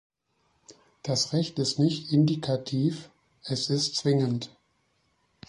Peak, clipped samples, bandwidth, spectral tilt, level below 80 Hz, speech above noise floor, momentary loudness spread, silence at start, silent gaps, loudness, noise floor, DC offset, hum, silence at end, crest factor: -12 dBFS; under 0.1%; 11.5 kHz; -5.5 dB/octave; -66 dBFS; 45 dB; 12 LU; 0.7 s; none; -27 LUFS; -72 dBFS; under 0.1%; none; 1 s; 18 dB